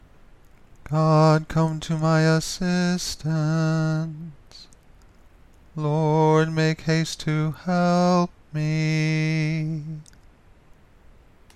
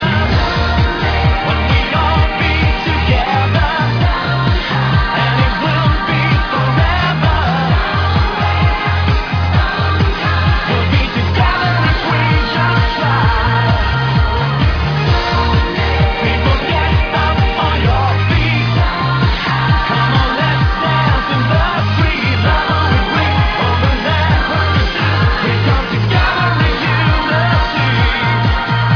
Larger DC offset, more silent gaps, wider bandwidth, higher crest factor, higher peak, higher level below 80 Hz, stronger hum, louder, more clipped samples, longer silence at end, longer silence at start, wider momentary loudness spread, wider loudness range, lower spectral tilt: neither; neither; first, 12.5 kHz vs 5.4 kHz; first, 18 dB vs 12 dB; second, -6 dBFS vs -2 dBFS; second, -50 dBFS vs -20 dBFS; neither; second, -22 LUFS vs -13 LUFS; neither; first, 1.55 s vs 0 s; first, 0.85 s vs 0 s; first, 11 LU vs 2 LU; first, 5 LU vs 1 LU; about the same, -6.5 dB/octave vs -7 dB/octave